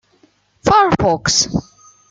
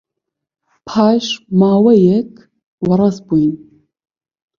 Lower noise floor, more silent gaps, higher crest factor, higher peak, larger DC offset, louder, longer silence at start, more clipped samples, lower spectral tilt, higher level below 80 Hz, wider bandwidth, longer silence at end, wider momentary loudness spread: second, -56 dBFS vs -79 dBFS; second, none vs 2.66-2.78 s; about the same, 16 dB vs 16 dB; about the same, -2 dBFS vs 0 dBFS; neither; about the same, -15 LUFS vs -14 LUFS; second, 0.65 s vs 0.85 s; neither; second, -3.5 dB/octave vs -7.5 dB/octave; first, -40 dBFS vs -54 dBFS; first, 10.5 kHz vs 7.2 kHz; second, 0.5 s vs 1 s; second, 9 LU vs 12 LU